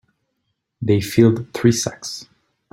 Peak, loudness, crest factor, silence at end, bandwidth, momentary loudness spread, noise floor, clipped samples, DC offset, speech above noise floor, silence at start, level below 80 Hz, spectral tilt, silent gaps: 0 dBFS; -18 LUFS; 20 dB; 0.5 s; 16.5 kHz; 15 LU; -74 dBFS; under 0.1%; under 0.1%; 56 dB; 0.8 s; -52 dBFS; -5.5 dB/octave; none